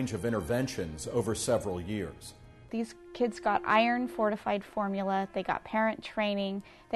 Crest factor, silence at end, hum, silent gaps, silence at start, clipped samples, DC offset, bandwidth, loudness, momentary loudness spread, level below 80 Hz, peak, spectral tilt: 18 dB; 0 s; none; none; 0 s; under 0.1%; under 0.1%; 12 kHz; -31 LUFS; 10 LU; -56 dBFS; -12 dBFS; -5 dB/octave